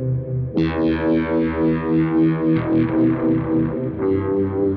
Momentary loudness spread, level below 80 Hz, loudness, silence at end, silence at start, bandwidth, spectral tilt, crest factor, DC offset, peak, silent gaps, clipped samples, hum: 5 LU; -40 dBFS; -19 LUFS; 0 s; 0 s; 4.9 kHz; -11 dB/octave; 10 dB; under 0.1%; -8 dBFS; none; under 0.1%; none